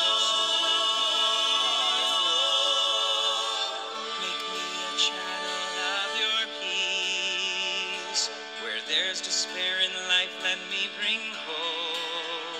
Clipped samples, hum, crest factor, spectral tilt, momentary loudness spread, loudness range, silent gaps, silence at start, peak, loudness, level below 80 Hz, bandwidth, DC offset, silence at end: under 0.1%; none; 18 dB; 1 dB/octave; 8 LU; 5 LU; none; 0 s; -10 dBFS; -25 LUFS; under -90 dBFS; 15.5 kHz; under 0.1%; 0 s